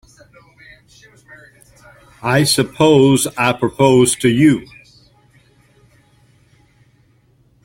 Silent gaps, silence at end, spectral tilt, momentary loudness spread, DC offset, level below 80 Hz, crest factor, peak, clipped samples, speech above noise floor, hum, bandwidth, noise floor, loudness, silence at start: none; 3 s; -5 dB/octave; 6 LU; under 0.1%; -50 dBFS; 16 dB; -2 dBFS; under 0.1%; 41 dB; none; 16.5 kHz; -55 dBFS; -14 LUFS; 2.25 s